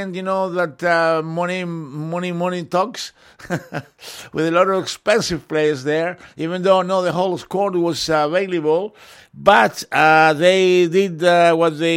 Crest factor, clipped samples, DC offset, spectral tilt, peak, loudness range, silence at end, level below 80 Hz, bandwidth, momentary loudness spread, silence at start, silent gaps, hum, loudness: 18 dB; under 0.1%; under 0.1%; -5 dB/octave; 0 dBFS; 7 LU; 0 s; -56 dBFS; 16.5 kHz; 14 LU; 0 s; none; none; -18 LUFS